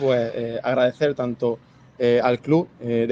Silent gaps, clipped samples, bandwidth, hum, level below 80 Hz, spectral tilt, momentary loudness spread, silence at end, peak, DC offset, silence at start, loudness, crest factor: none; under 0.1%; 7.4 kHz; none; -62 dBFS; -7.5 dB/octave; 7 LU; 0 s; -4 dBFS; under 0.1%; 0 s; -22 LUFS; 16 dB